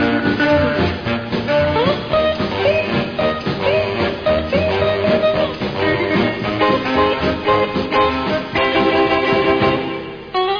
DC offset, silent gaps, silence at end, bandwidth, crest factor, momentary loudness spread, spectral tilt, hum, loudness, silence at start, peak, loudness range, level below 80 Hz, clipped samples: under 0.1%; none; 0 s; 5.4 kHz; 14 dB; 5 LU; -7 dB/octave; none; -17 LUFS; 0 s; -2 dBFS; 2 LU; -38 dBFS; under 0.1%